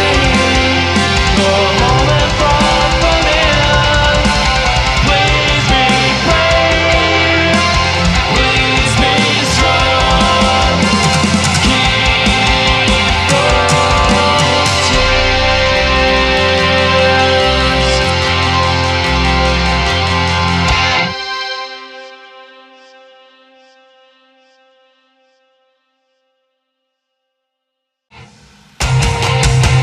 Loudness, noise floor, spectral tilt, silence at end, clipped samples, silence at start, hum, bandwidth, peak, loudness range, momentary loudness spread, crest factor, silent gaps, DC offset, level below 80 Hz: -11 LUFS; -75 dBFS; -4 dB/octave; 0 s; under 0.1%; 0 s; none; 13 kHz; 0 dBFS; 6 LU; 3 LU; 12 dB; none; under 0.1%; -22 dBFS